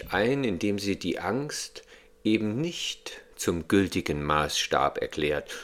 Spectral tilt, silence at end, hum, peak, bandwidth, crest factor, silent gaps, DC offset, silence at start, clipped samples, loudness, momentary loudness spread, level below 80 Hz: -4.5 dB/octave; 0 s; none; -6 dBFS; 16.5 kHz; 22 dB; none; under 0.1%; 0 s; under 0.1%; -28 LUFS; 8 LU; -52 dBFS